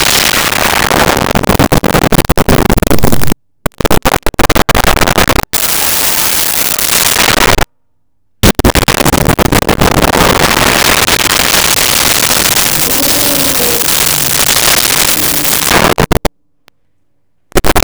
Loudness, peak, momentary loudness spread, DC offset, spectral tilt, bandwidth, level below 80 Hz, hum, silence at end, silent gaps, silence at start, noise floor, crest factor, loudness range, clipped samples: -8 LUFS; 0 dBFS; 5 LU; under 0.1%; -2.5 dB/octave; over 20 kHz; -22 dBFS; none; 0 s; none; 0 s; -65 dBFS; 10 dB; 4 LU; under 0.1%